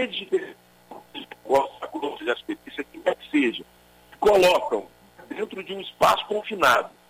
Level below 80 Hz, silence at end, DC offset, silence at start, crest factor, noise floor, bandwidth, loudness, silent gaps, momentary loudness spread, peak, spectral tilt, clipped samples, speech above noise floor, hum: -58 dBFS; 0.2 s; under 0.1%; 0 s; 18 dB; -54 dBFS; 16 kHz; -24 LUFS; none; 18 LU; -6 dBFS; -3.5 dB/octave; under 0.1%; 31 dB; 60 Hz at -60 dBFS